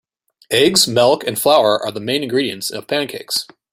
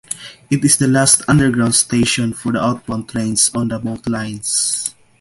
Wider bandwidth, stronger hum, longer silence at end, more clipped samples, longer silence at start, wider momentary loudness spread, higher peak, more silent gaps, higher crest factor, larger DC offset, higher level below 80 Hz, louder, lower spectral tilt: first, 16.5 kHz vs 12 kHz; neither; about the same, 0.3 s vs 0.3 s; neither; first, 0.5 s vs 0.1 s; second, 9 LU vs 12 LU; about the same, 0 dBFS vs 0 dBFS; neither; about the same, 18 dB vs 16 dB; neither; second, -58 dBFS vs -46 dBFS; about the same, -16 LUFS vs -15 LUFS; about the same, -3 dB/octave vs -3.5 dB/octave